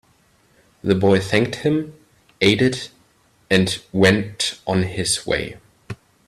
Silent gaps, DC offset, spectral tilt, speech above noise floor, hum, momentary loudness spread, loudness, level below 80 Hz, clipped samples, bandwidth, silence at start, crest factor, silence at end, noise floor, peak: none; under 0.1%; -4.5 dB/octave; 39 dB; none; 18 LU; -19 LUFS; -50 dBFS; under 0.1%; 13.5 kHz; 0.85 s; 20 dB; 0.35 s; -58 dBFS; 0 dBFS